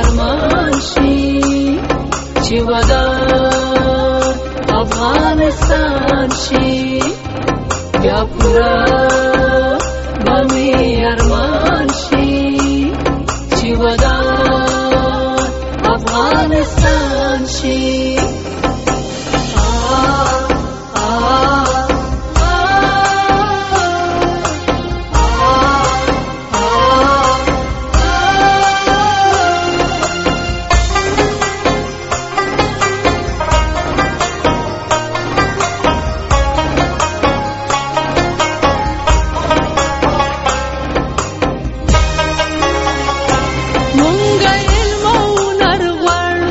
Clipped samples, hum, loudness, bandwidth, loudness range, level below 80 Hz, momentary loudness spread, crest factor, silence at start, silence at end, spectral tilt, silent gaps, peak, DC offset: under 0.1%; none; -13 LUFS; 8.2 kHz; 3 LU; -20 dBFS; 6 LU; 12 dB; 0 s; 0 s; -4.5 dB/octave; none; 0 dBFS; under 0.1%